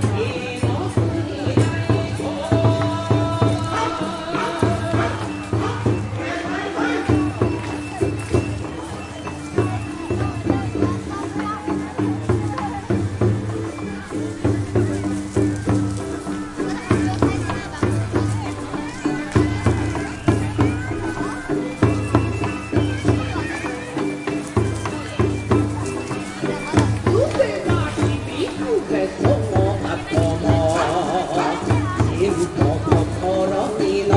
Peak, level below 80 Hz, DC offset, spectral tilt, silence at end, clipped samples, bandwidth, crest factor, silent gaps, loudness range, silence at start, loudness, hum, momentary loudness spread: 0 dBFS; -40 dBFS; under 0.1%; -6.5 dB/octave; 0 s; under 0.1%; 11.5 kHz; 20 dB; none; 4 LU; 0 s; -22 LUFS; none; 7 LU